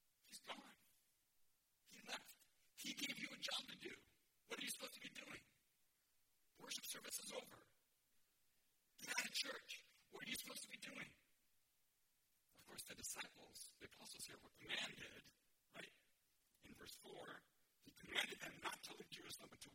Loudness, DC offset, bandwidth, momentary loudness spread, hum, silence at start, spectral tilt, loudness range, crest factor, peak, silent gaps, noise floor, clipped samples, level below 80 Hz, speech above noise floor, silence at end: -51 LUFS; under 0.1%; 16.5 kHz; 17 LU; none; 0.25 s; -0.5 dB/octave; 6 LU; 28 dB; -28 dBFS; none; -83 dBFS; under 0.1%; -86 dBFS; 29 dB; 0 s